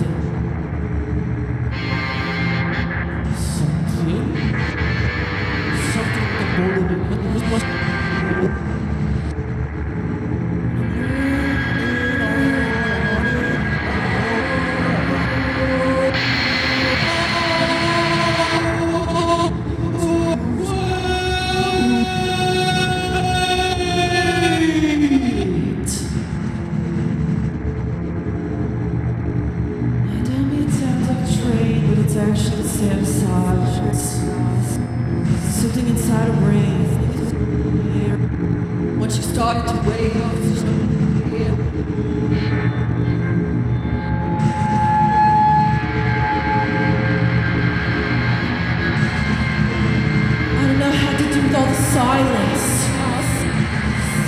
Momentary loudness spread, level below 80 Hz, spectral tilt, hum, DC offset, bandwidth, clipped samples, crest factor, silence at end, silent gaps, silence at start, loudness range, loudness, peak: 6 LU; -32 dBFS; -5.5 dB/octave; none; under 0.1%; 15.5 kHz; under 0.1%; 14 dB; 0 s; none; 0 s; 5 LU; -19 LUFS; -4 dBFS